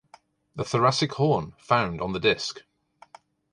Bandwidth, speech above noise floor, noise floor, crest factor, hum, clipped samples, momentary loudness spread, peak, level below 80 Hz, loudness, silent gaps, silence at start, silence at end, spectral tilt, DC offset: 11 kHz; 32 dB; -57 dBFS; 20 dB; none; under 0.1%; 12 LU; -6 dBFS; -56 dBFS; -25 LUFS; none; 0.55 s; 0.95 s; -5 dB/octave; under 0.1%